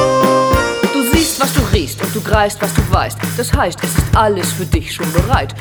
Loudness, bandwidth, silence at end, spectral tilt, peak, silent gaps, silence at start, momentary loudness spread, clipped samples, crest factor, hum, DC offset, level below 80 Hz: -15 LUFS; over 20 kHz; 0 s; -4.5 dB/octave; 0 dBFS; none; 0 s; 6 LU; under 0.1%; 14 dB; none; under 0.1%; -24 dBFS